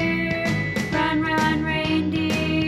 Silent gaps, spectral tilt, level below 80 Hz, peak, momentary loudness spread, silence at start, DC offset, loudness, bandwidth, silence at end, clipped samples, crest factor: none; -5.5 dB/octave; -42 dBFS; -8 dBFS; 2 LU; 0 s; under 0.1%; -22 LUFS; 14.5 kHz; 0 s; under 0.1%; 14 dB